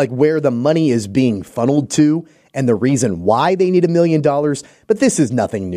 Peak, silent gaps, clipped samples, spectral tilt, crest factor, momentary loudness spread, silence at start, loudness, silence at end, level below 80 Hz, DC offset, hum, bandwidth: -2 dBFS; none; under 0.1%; -6 dB/octave; 12 dB; 6 LU; 0 s; -16 LUFS; 0 s; -54 dBFS; under 0.1%; none; 14.5 kHz